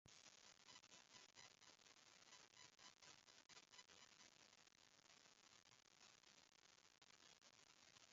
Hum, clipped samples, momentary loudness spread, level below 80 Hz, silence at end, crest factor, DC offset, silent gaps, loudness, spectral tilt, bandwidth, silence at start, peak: none; under 0.1%; 4 LU; under -90 dBFS; 0 s; 22 dB; under 0.1%; none; -67 LUFS; 0 dB/octave; 7.6 kHz; 0.05 s; -48 dBFS